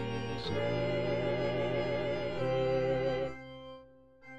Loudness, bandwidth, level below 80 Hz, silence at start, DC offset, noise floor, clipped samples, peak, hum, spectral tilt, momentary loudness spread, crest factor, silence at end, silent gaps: -33 LUFS; 8.8 kHz; -56 dBFS; 0 s; 0.4%; -57 dBFS; under 0.1%; -20 dBFS; none; -7 dB/octave; 16 LU; 12 dB; 0 s; none